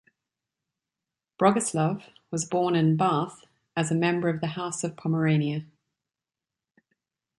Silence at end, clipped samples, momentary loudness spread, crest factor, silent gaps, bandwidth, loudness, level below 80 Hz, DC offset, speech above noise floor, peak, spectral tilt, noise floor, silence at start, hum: 1.75 s; under 0.1%; 11 LU; 22 dB; none; 11.5 kHz; -26 LUFS; -70 dBFS; under 0.1%; 65 dB; -6 dBFS; -5.5 dB/octave; -90 dBFS; 1.4 s; none